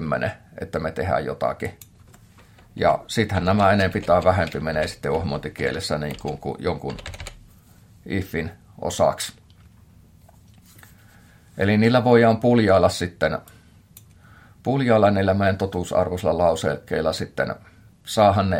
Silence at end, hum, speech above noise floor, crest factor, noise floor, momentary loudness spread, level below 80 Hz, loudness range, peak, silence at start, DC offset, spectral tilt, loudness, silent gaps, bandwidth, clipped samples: 0 s; none; 30 dB; 20 dB; -51 dBFS; 14 LU; -48 dBFS; 9 LU; -2 dBFS; 0 s; under 0.1%; -6 dB/octave; -22 LUFS; none; 16.5 kHz; under 0.1%